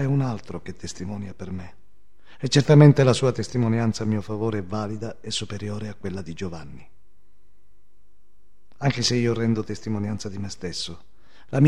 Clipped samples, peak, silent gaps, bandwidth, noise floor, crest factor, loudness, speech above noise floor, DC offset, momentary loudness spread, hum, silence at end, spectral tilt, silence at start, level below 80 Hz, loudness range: under 0.1%; -2 dBFS; none; 10.5 kHz; -64 dBFS; 22 dB; -24 LUFS; 41 dB; 1%; 17 LU; none; 0 s; -6 dB/octave; 0 s; -54 dBFS; 14 LU